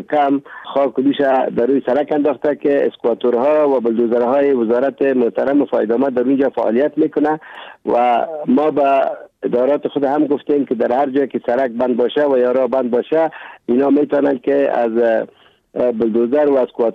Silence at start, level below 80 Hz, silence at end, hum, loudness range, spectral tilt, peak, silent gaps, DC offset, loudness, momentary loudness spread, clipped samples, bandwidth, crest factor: 0 s; -62 dBFS; 0 s; none; 1 LU; -8 dB/octave; -6 dBFS; none; under 0.1%; -16 LUFS; 5 LU; under 0.1%; 5.4 kHz; 10 dB